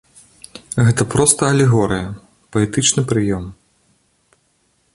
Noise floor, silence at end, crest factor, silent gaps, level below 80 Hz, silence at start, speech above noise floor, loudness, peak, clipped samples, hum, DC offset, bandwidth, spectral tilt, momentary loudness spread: -62 dBFS; 1.4 s; 18 dB; none; -42 dBFS; 0.55 s; 47 dB; -16 LUFS; 0 dBFS; under 0.1%; none; under 0.1%; 11.5 kHz; -4.5 dB/octave; 20 LU